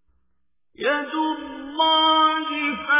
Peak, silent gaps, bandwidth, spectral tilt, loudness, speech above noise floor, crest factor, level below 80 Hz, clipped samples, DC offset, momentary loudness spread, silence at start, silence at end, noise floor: -8 dBFS; none; 3.9 kHz; -5.5 dB/octave; -20 LUFS; 56 dB; 16 dB; -62 dBFS; under 0.1%; under 0.1%; 11 LU; 0.8 s; 0 s; -77 dBFS